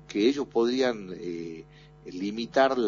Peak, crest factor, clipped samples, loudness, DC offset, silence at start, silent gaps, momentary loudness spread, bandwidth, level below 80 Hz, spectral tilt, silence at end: -8 dBFS; 20 dB; under 0.1%; -28 LUFS; under 0.1%; 0.1 s; none; 17 LU; 7.4 kHz; -60 dBFS; -3.5 dB/octave; 0 s